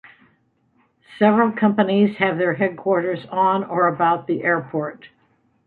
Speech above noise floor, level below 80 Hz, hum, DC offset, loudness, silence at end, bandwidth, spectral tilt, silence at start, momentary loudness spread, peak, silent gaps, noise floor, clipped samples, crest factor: 44 dB; -66 dBFS; none; under 0.1%; -19 LUFS; 0.6 s; 4.4 kHz; -9.5 dB/octave; 1.1 s; 5 LU; -2 dBFS; none; -63 dBFS; under 0.1%; 18 dB